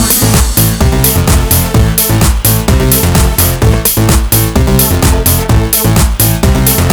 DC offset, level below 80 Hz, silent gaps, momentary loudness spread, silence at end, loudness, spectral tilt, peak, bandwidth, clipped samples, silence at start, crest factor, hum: under 0.1%; -14 dBFS; none; 1 LU; 0 s; -8 LUFS; -4.5 dB/octave; 0 dBFS; over 20 kHz; 0.4%; 0 s; 8 dB; none